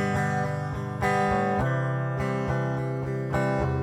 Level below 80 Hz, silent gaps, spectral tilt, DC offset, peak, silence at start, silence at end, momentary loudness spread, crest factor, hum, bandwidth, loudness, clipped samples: -44 dBFS; none; -7.5 dB/octave; under 0.1%; -12 dBFS; 0 s; 0 s; 5 LU; 14 dB; none; 12 kHz; -27 LUFS; under 0.1%